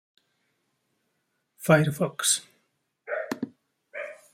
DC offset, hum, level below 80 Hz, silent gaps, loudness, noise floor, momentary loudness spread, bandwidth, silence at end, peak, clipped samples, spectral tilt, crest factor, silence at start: under 0.1%; none; -68 dBFS; none; -26 LUFS; -76 dBFS; 17 LU; 16 kHz; 0.2 s; -6 dBFS; under 0.1%; -4 dB/octave; 24 dB; 1.6 s